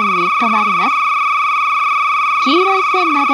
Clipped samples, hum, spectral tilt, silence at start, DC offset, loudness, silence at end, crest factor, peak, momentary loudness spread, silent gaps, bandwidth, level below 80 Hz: under 0.1%; none; -3.5 dB/octave; 0 s; under 0.1%; -13 LUFS; 0 s; 12 dB; -2 dBFS; 2 LU; none; 15.5 kHz; -68 dBFS